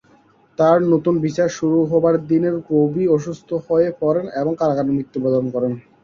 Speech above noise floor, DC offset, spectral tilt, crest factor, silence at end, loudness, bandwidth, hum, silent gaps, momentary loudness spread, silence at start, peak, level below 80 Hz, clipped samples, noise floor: 36 dB; under 0.1%; -8 dB/octave; 16 dB; 0.25 s; -18 LUFS; 7.4 kHz; none; none; 7 LU; 0.6 s; -2 dBFS; -58 dBFS; under 0.1%; -53 dBFS